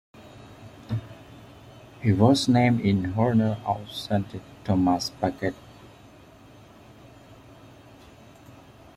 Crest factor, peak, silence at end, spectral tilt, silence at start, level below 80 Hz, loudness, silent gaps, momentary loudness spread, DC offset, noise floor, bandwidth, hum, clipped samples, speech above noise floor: 22 dB; -4 dBFS; 1.6 s; -6.5 dB/octave; 0.2 s; -56 dBFS; -24 LUFS; none; 26 LU; under 0.1%; -50 dBFS; 15 kHz; none; under 0.1%; 27 dB